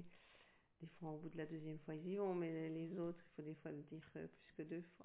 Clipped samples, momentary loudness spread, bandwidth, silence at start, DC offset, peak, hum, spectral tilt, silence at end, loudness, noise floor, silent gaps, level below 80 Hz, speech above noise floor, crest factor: under 0.1%; 18 LU; 4 kHz; 0 s; under 0.1%; -34 dBFS; none; -7.5 dB/octave; 0 s; -49 LUFS; -72 dBFS; none; -82 dBFS; 23 dB; 16 dB